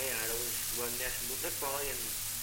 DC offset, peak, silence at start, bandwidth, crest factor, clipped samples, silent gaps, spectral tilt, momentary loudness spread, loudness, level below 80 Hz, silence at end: under 0.1%; -20 dBFS; 0 s; 17 kHz; 16 dB; under 0.1%; none; -1 dB/octave; 2 LU; -33 LUFS; -54 dBFS; 0 s